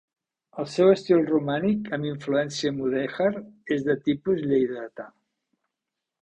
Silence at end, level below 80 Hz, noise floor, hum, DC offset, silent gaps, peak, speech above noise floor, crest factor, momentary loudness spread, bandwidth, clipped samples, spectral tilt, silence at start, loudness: 1.15 s; -62 dBFS; -85 dBFS; none; under 0.1%; none; -8 dBFS; 61 dB; 18 dB; 15 LU; 9 kHz; under 0.1%; -6.5 dB/octave; 0.55 s; -25 LUFS